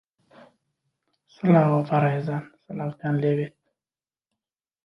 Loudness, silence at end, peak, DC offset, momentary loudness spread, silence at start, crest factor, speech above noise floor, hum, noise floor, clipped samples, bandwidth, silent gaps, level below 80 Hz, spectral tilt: -24 LUFS; 1.35 s; -6 dBFS; under 0.1%; 14 LU; 1.45 s; 20 dB; over 68 dB; none; under -90 dBFS; under 0.1%; 5.8 kHz; none; -68 dBFS; -10 dB/octave